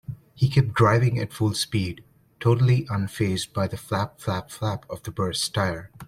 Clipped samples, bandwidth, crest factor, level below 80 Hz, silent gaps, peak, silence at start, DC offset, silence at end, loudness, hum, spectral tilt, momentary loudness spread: under 0.1%; 15.5 kHz; 20 dB; -52 dBFS; none; -4 dBFS; 0.1 s; under 0.1%; 0.05 s; -24 LUFS; none; -5.5 dB/octave; 10 LU